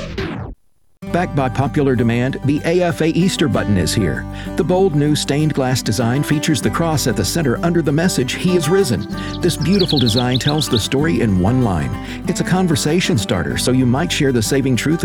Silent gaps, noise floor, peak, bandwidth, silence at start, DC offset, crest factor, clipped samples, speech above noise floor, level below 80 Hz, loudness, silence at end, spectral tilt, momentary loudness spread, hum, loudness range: none; -48 dBFS; -2 dBFS; 19 kHz; 0 s; under 0.1%; 14 dB; under 0.1%; 32 dB; -36 dBFS; -17 LUFS; 0 s; -5.5 dB/octave; 7 LU; none; 1 LU